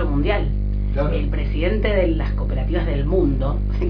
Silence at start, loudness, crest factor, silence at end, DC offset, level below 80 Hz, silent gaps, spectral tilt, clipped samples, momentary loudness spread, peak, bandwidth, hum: 0 s; -21 LUFS; 14 dB; 0 s; under 0.1%; -22 dBFS; none; -10 dB/octave; under 0.1%; 4 LU; -6 dBFS; 5.2 kHz; 50 Hz at -20 dBFS